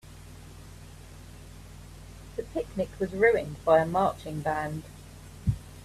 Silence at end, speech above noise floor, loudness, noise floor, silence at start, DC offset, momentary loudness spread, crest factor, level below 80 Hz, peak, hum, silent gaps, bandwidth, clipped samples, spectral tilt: 0 s; 20 dB; -28 LUFS; -47 dBFS; 0.05 s; under 0.1%; 24 LU; 22 dB; -48 dBFS; -10 dBFS; none; none; 14.5 kHz; under 0.1%; -6.5 dB/octave